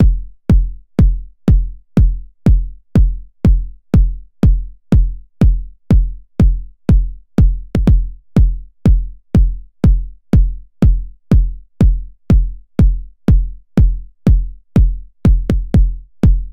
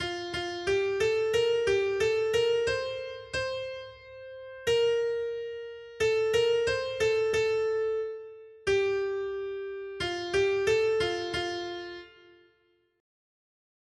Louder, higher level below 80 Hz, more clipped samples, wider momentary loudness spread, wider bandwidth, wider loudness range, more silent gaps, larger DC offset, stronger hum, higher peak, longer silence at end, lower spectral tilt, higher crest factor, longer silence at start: first, -16 LUFS vs -29 LUFS; first, -14 dBFS vs -58 dBFS; neither; second, 5 LU vs 14 LU; second, 4.8 kHz vs 12.5 kHz; second, 1 LU vs 4 LU; neither; neither; neither; first, 0 dBFS vs -14 dBFS; second, 0 s vs 1.9 s; first, -9.5 dB/octave vs -3.5 dB/octave; about the same, 12 dB vs 16 dB; about the same, 0 s vs 0 s